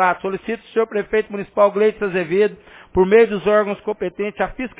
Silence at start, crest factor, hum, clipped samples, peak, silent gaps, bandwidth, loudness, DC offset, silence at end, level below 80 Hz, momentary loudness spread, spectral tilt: 0 s; 16 dB; none; under 0.1%; -2 dBFS; none; 4 kHz; -19 LUFS; under 0.1%; 0.1 s; -48 dBFS; 10 LU; -10 dB/octave